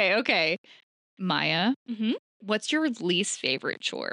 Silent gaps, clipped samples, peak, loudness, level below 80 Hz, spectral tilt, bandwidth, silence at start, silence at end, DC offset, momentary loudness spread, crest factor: 0.58-0.64 s, 0.83-1.17 s, 1.76-1.86 s, 2.19-2.40 s; under 0.1%; -8 dBFS; -27 LUFS; -80 dBFS; -3.5 dB/octave; 11.5 kHz; 0 s; 0 s; under 0.1%; 7 LU; 20 dB